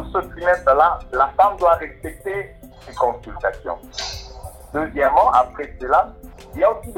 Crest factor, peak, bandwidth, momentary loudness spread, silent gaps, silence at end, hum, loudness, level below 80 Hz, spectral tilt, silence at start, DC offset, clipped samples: 16 dB; -4 dBFS; 17 kHz; 16 LU; none; 0 s; none; -19 LUFS; -40 dBFS; -4.5 dB/octave; 0 s; under 0.1%; under 0.1%